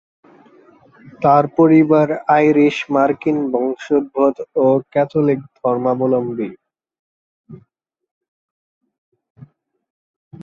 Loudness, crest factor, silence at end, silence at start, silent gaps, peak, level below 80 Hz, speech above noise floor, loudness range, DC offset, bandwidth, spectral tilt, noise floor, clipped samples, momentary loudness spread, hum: -16 LUFS; 16 dB; 0 s; 1.2 s; 6.99-7.44 s, 8.11-8.21 s, 8.28-8.81 s, 8.98-9.12 s, 9.30-9.35 s, 9.90-10.31 s; -2 dBFS; -60 dBFS; 46 dB; 10 LU; under 0.1%; 7.2 kHz; -8 dB/octave; -61 dBFS; under 0.1%; 8 LU; none